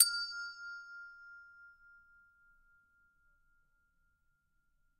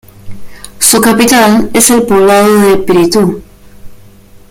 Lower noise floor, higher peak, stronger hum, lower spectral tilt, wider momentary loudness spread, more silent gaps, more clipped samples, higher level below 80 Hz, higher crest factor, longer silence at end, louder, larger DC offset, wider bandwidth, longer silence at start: first, -77 dBFS vs -36 dBFS; second, -8 dBFS vs 0 dBFS; neither; second, 6 dB/octave vs -3.5 dB/octave; first, 22 LU vs 4 LU; neither; second, under 0.1% vs 0.4%; second, -78 dBFS vs -36 dBFS; first, 34 dB vs 8 dB; first, 3.3 s vs 0.55 s; second, -37 LUFS vs -7 LUFS; neither; second, 12 kHz vs over 20 kHz; second, 0 s vs 0.25 s